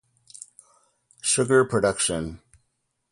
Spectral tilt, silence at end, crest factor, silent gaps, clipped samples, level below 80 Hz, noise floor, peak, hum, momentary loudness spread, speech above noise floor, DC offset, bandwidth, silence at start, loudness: -3.5 dB/octave; 0.75 s; 18 dB; none; under 0.1%; -52 dBFS; -75 dBFS; -8 dBFS; none; 24 LU; 52 dB; under 0.1%; 11.5 kHz; 1.25 s; -22 LUFS